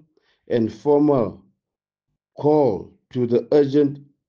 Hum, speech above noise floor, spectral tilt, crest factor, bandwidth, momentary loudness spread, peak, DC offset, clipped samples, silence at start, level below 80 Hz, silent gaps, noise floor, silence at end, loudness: none; 68 dB; -9 dB/octave; 16 dB; 6.8 kHz; 10 LU; -6 dBFS; under 0.1%; under 0.1%; 0.5 s; -60 dBFS; none; -87 dBFS; 0.3 s; -20 LUFS